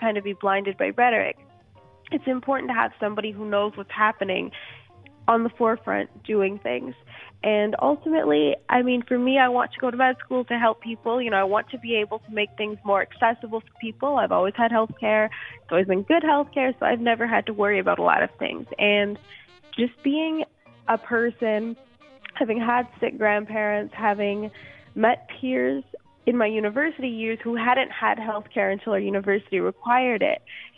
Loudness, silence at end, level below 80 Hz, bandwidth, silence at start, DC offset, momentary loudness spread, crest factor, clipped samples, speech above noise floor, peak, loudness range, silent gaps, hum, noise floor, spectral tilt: -24 LUFS; 0.1 s; -68 dBFS; 4.7 kHz; 0 s; under 0.1%; 9 LU; 20 dB; under 0.1%; 30 dB; -4 dBFS; 4 LU; none; none; -53 dBFS; -8 dB/octave